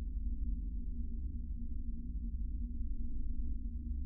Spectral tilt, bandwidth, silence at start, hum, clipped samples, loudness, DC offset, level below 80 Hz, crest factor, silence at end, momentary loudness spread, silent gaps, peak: -17.5 dB/octave; 0.5 kHz; 0 s; none; under 0.1%; -44 LUFS; under 0.1%; -38 dBFS; 10 dB; 0 s; 3 LU; none; -26 dBFS